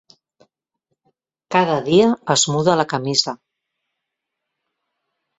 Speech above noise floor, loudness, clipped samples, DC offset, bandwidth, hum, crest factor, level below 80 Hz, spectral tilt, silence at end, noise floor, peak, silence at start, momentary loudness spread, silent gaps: 63 dB; -17 LUFS; under 0.1%; under 0.1%; 8.2 kHz; none; 20 dB; -62 dBFS; -4 dB/octave; 2.05 s; -80 dBFS; -2 dBFS; 1.5 s; 6 LU; none